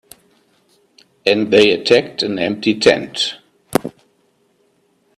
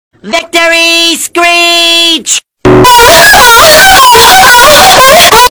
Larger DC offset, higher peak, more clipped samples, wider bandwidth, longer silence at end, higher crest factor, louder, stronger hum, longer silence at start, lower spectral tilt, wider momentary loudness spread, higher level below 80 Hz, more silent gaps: neither; about the same, 0 dBFS vs 0 dBFS; second, under 0.1% vs 50%; second, 14.5 kHz vs over 20 kHz; first, 1.25 s vs 0 s; first, 18 dB vs 2 dB; second, -16 LUFS vs -1 LUFS; neither; first, 1.25 s vs 0.25 s; first, -4 dB/octave vs -1.5 dB/octave; about the same, 10 LU vs 8 LU; second, -56 dBFS vs -26 dBFS; neither